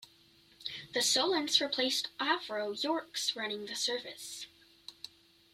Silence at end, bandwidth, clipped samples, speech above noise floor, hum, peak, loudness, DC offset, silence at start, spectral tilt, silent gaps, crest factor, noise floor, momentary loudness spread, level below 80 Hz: 0.45 s; 16 kHz; under 0.1%; 30 dB; none; -14 dBFS; -32 LUFS; under 0.1%; 0 s; -0.5 dB/octave; none; 22 dB; -64 dBFS; 20 LU; -78 dBFS